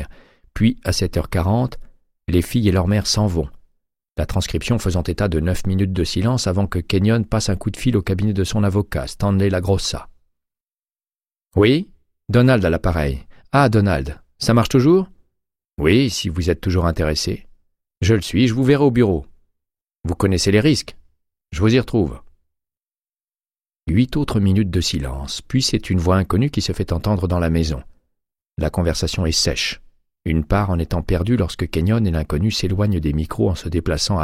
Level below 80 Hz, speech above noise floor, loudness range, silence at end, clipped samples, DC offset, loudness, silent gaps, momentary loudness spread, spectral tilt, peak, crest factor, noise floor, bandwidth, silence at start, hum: -32 dBFS; over 72 dB; 4 LU; 0 s; under 0.1%; under 0.1%; -19 LUFS; none; 10 LU; -6 dB/octave; -2 dBFS; 18 dB; under -90 dBFS; 15.5 kHz; 0 s; none